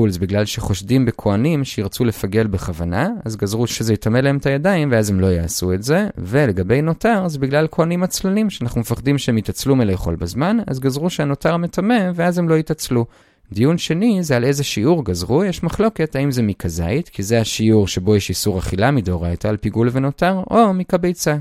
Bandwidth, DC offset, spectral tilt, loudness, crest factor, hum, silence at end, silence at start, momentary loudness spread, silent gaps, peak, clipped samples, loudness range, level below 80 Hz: 16 kHz; under 0.1%; -6 dB/octave; -18 LUFS; 16 dB; none; 0 s; 0 s; 5 LU; none; 0 dBFS; under 0.1%; 2 LU; -38 dBFS